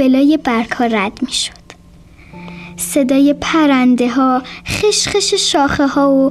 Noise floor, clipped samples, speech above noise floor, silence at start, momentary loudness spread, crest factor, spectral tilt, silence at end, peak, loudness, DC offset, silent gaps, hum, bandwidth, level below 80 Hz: -41 dBFS; under 0.1%; 28 dB; 0 s; 11 LU; 12 dB; -3.5 dB/octave; 0 s; -2 dBFS; -14 LUFS; under 0.1%; none; none; 14.5 kHz; -42 dBFS